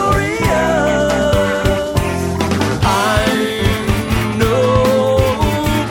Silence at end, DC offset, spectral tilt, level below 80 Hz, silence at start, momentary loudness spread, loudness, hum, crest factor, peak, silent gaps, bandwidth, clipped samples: 0 s; under 0.1%; -5.5 dB/octave; -26 dBFS; 0 s; 4 LU; -15 LUFS; none; 14 dB; 0 dBFS; none; 17.5 kHz; under 0.1%